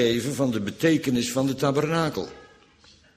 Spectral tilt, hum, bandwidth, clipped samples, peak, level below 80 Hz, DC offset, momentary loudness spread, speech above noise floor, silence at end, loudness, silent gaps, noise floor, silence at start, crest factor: -5 dB/octave; none; 15.5 kHz; under 0.1%; -8 dBFS; -56 dBFS; under 0.1%; 5 LU; 32 dB; 0.7 s; -24 LUFS; none; -55 dBFS; 0 s; 18 dB